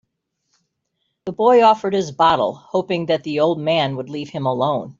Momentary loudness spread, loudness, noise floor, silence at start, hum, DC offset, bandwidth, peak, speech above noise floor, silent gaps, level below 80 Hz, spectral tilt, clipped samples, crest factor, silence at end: 12 LU; -18 LUFS; -73 dBFS; 1.25 s; none; under 0.1%; 7.6 kHz; -2 dBFS; 55 dB; none; -60 dBFS; -6 dB/octave; under 0.1%; 16 dB; 0.1 s